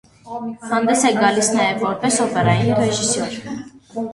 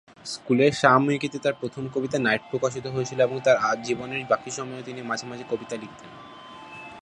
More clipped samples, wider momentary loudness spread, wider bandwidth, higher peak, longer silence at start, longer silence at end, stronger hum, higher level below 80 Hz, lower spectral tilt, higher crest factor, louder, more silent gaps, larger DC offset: neither; second, 15 LU vs 21 LU; about the same, 11.5 kHz vs 11 kHz; about the same, -2 dBFS vs -2 dBFS; about the same, 0.25 s vs 0.25 s; about the same, 0 s vs 0 s; neither; first, -52 dBFS vs -64 dBFS; about the same, -4 dB/octave vs -5 dB/octave; about the same, 18 dB vs 22 dB; first, -17 LUFS vs -25 LUFS; neither; neither